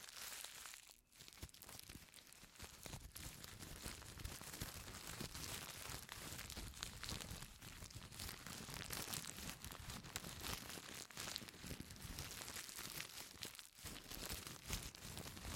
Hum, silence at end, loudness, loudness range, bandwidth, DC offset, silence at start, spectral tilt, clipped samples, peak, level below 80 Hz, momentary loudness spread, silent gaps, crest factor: none; 0 s; -51 LUFS; 5 LU; 17 kHz; under 0.1%; 0 s; -2.5 dB/octave; under 0.1%; -22 dBFS; -62 dBFS; 8 LU; none; 30 dB